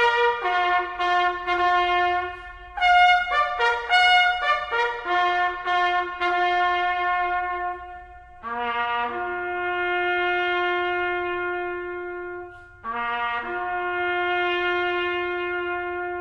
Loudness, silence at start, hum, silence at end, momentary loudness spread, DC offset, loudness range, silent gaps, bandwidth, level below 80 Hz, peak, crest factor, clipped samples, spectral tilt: -23 LUFS; 0 s; none; 0 s; 14 LU; under 0.1%; 7 LU; none; 9.2 kHz; -52 dBFS; -6 dBFS; 18 dB; under 0.1%; -3.5 dB/octave